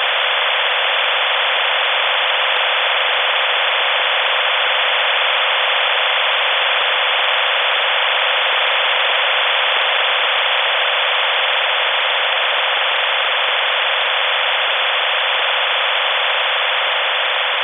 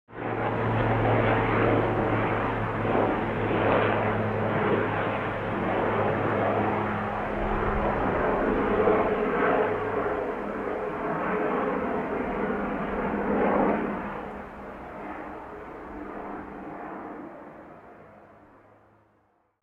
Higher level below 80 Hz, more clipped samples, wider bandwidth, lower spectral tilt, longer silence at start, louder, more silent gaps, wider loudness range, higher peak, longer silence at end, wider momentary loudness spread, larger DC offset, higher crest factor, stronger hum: second, -84 dBFS vs -44 dBFS; neither; second, 4.4 kHz vs 6.4 kHz; second, 0.5 dB/octave vs -9 dB/octave; about the same, 0 s vs 0.1 s; first, -14 LUFS vs -26 LUFS; neither; second, 1 LU vs 14 LU; first, -2 dBFS vs -10 dBFS; second, 0 s vs 1.35 s; second, 1 LU vs 16 LU; neither; about the same, 14 dB vs 18 dB; neither